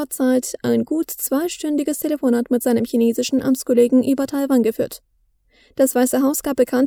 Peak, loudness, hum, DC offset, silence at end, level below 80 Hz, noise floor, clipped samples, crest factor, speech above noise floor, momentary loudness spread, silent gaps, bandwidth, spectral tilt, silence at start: -4 dBFS; -19 LUFS; none; under 0.1%; 0 s; -56 dBFS; -60 dBFS; under 0.1%; 14 dB; 42 dB; 6 LU; none; over 20 kHz; -4.5 dB/octave; 0 s